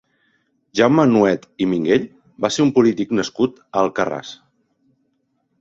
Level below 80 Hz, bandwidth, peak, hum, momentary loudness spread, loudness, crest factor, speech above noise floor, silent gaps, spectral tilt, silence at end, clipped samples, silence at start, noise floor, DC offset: -58 dBFS; 7.8 kHz; -2 dBFS; none; 11 LU; -18 LUFS; 18 dB; 51 dB; none; -5.5 dB/octave; 1.25 s; under 0.1%; 0.75 s; -68 dBFS; under 0.1%